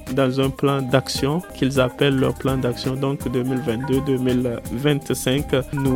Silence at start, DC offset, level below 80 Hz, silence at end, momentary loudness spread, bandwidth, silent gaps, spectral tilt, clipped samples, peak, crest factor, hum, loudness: 0 s; under 0.1%; -40 dBFS; 0 s; 5 LU; 17 kHz; none; -6 dB/octave; under 0.1%; -2 dBFS; 18 dB; none; -21 LUFS